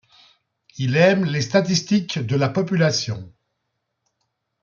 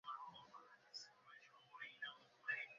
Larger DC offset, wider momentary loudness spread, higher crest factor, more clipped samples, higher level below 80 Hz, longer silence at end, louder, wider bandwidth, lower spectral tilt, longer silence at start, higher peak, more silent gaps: neither; second, 9 LU vs 16 LU; about the same, 18 dB vs 22 dB; neither; first, -62 dBFS vs under -90 dBFS; first, 1.35 s vs 0 s; first, -20 LUFS vs -53 LUFS; about the same, 7.4 kHz vs 7.2 kHz; first, -5.5 dB/octave vs 2 dB/octave; first, 0.75 s vs 0.05 s; first, -4 dBFS vs -32 dBFS; neither